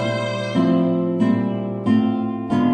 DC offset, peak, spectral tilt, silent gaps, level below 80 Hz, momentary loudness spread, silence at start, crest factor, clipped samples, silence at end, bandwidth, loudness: under 0.1%; -6 dBFS; -7.5 dB/octave; none; -56 dBFS; 6 LU; 0 s; 12 dB; under 0.1%; 0 s; 9 kHz; -20 LUFS